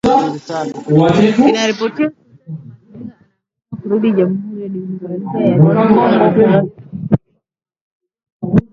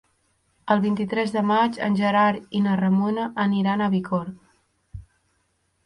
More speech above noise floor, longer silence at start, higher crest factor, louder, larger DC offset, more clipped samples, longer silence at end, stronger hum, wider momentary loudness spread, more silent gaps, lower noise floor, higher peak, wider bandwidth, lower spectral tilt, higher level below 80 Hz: first, 58 dB vs 48 dB; second, 0.05 s vs 0.65 s; about the same, 14 dB vs 18 dB; first, -14 LUFS vs -22 LUFS; neither; neither; second, 0.1 s vs 0.85 s; neither; first, 21 LU vs 5 LU; first, 7.81-8.00 s, 8.32-8.40 s vs none; about the same, -70 dBFS vs -69 dBFS; first, 0 dBFS vs -6 dBFS; second, 7.8 kHz vs 10.5 kHz; about the same, -7.5 dB/octave vs -7.5 dB/octave; first, -46 dBFS vs -56 dBFS